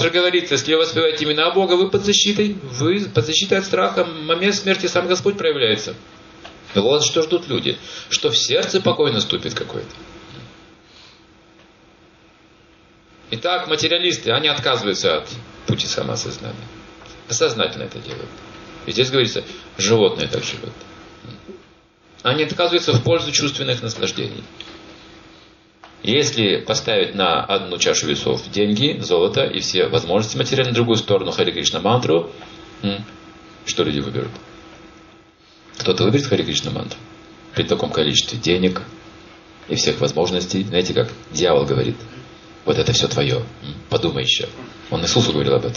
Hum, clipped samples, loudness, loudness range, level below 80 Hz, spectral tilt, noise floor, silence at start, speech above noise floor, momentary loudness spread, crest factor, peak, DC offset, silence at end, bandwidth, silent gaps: none; under 0.1%; -18 LUFS; 6 LU; -50 dBFS; -4 dB/octave; -51 dBFS; 0 s; 32 dB; 17 LU; 20 dB; -2 dBFS; under 0.1%; 0 s; 7.2 kHz; none